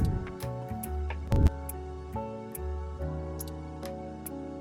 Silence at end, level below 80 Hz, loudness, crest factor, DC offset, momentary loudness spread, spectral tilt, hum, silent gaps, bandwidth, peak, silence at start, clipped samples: 0 s; -36 dBFS; -35 LUFS; 22 dB; under 0.1%; 12 LU; -7 dB/octave; none; none; 17 kHz; -10 dBFS; 0 s; under 0.1%